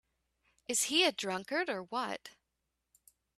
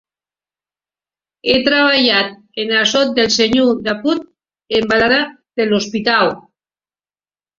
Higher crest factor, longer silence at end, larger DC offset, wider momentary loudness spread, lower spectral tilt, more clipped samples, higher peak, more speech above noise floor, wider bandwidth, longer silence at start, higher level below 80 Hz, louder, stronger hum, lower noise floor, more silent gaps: first, 22 dB vs 16 dB; about the same, 1.1 s vs 1.2 s; neither; about the same, 13 LU vs 11 LU; second, -1 dB/octave vs -3 dB/octave; neither; second, -14 dBFS vs 0 dBFS; second, 51 dB vs over 76 dB; first, 15 kHz vs 7.6 kHz; second, 0.7 s vs 1.45 s; second, -80 dBFS vs -52 dBFS; second, -33 LUFS vs -14 LUFS; neither; second, -85 dBFS vs under -90 dBFS; neither